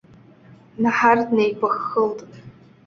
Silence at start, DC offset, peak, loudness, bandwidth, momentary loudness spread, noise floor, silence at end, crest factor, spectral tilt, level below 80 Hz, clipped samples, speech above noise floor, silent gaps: 0.8 s; under 0.1%; -2 dBFS; -20 LUFS; 7 kHz; 8 LU; -48 dBFS; 0.35 s; 20 dB; -6 dB/octave; -64 dBFS; under 0.1%; 29 dB; none